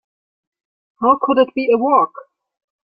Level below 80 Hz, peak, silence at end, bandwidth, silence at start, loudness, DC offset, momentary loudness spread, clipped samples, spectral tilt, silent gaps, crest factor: -64 dBFS; -2 dBFS; 0.65 s; 5 kHz; 1 s; -16 LUFS; under 0.1%; 5 LU; under 0.1%; -9 dB/octave; none; 16 dB